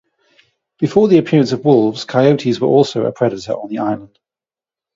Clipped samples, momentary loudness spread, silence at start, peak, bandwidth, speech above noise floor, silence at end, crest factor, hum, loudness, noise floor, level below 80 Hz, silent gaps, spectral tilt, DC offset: under 0.1%; 10 LU; 0.8 s; 0 dBFS; 7.8 kHz; over 76 dB; 0.9 s; 16 dB; none; -15 LUFS; under -90 dBFS; -58 dBFS; none; -7 dB/octave; under 0.1%